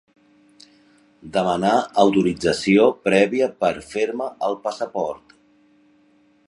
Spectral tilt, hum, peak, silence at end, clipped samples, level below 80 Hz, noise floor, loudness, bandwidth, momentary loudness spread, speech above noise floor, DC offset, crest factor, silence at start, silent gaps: -5.5 dB/octave; none; -2 dBFS; 1.3 s; under 0.1%; -56 dBFS; -58 dBFS; -20 LUFS; 11.5 kHz; 10 LU; 38 dB; under 0.1%; 20 dB; 1.25 s; none